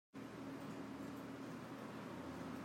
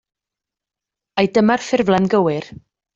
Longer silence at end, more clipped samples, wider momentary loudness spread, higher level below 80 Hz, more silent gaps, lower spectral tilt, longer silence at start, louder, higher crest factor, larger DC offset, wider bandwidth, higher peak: second, 0 s vs 0.4 s; neither; second, 1 LU vs 11 LU; second, -80 dBFS vs -56 dBFS; neither; about the same, -6 dB/octave vs -6 dB/octave; second, 0.15 s vs 1.15 s; second, -50 LUFS vs -17 LUFS; about the same, 12 dB vs 16 dB; neither; first, 16 kHz vs 7.8 kHz; second, -36 dBFS vs -2 dBFS